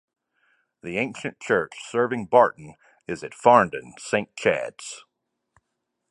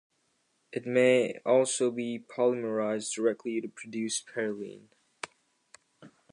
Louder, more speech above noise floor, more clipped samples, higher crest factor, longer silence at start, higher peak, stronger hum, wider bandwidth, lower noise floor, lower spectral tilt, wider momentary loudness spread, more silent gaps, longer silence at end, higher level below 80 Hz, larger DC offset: first, -23 LUFS vs -29 LUFS; first, 56 dB vs 45 dB; neither; first, 24 dB vs 18 dB; about the same, 0.85 s vs 0.75 s; first, -2 dBFS vs -12 dBFS; neither; about the same, 11.5 kHz vs 11 kHz; first, -80 dBFS vs -74 dBFS; about the same, -5 dB/octave vs -4 dB/octave; first, 20 LU vs 17 LU; neither; first, 1.15 s vs 0.25 s; first, -64 dBFS vs -84 dBFS; neither